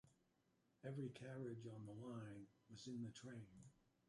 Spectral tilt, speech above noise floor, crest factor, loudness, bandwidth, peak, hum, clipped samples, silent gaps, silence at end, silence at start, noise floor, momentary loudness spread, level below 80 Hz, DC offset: -6.5 dB/octave; 29 dB; 16 dB; -55 LUFS; 11.5 kHz; -40 dBFS; none; under 0.1%; none; 0.35 s; 0.05 s; -83 dBFS; 10 LU; -84 dBFS; under 0.1%